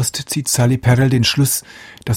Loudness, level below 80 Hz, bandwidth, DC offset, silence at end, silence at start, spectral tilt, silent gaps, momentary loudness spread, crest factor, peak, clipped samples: -15 LUFS; -44 dBFS; 16.5 kHz; under 0.1%; 0 s; 0 s; -4.5 dB/octave; none; 7 LU; 14 dB; -2 dBFS; under 0.1%